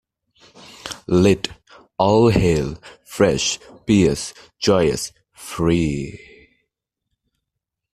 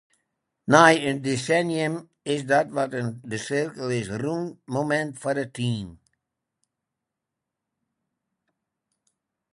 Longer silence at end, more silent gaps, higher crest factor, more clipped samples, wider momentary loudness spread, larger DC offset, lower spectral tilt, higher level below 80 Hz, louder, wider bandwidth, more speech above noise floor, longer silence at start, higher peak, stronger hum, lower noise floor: second, 1.8 s vs 3.6 s; neither; second, 18 dB vs 26 dB; neither; first, 18 LU vs 14 LU; neither; about the same, -5.5 dB/octave vs -5 dB/octave; first, -42 dBFS vs -64 dBFS; first, -19 LUFS vs -24 LUFS; first, 14 kHz vs 11.5 kHz; about the same, 63 dB vs 61 dB; first, 0.85 s vs 0.65 s; about the same, -2 dBFS vs 0 dBFS; neither; second, -81 dBFS vs -85 dBFS